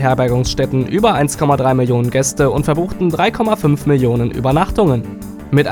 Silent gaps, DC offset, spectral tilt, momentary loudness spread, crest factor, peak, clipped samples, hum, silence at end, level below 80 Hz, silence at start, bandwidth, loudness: none; under 0.1%; -6 dB/octave; 4 LU; 14 dB; 0 dBFS; under 0.1%; none; 0 s; -32 dBFS; 0 s; 18 kHz; -15 LUFS